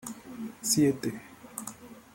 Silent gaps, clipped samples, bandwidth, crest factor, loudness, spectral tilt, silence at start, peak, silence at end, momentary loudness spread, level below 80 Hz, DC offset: none; under 0.1%; 16.5 kHz; 22 dB; -29 LUFS; -4 dB/octave; 0.05 s; -10 dBFS; 0.15 s; 19 LU; -66 dBFS; under 0.1%